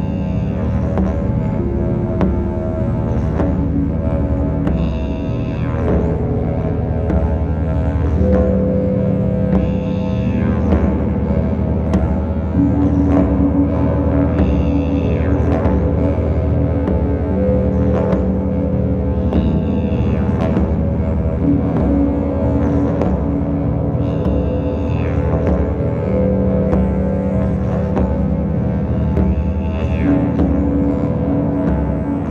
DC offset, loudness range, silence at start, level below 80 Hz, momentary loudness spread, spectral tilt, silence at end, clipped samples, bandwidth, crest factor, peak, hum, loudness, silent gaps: under 0.1%; 3 LU; 0 s; -22 dBFS; 4 LU; -10.5 dB/octave; 0 s; under 0.1%; 4.8 kHz; 16 dB; 0 dBFS; none; -17 LUFS; none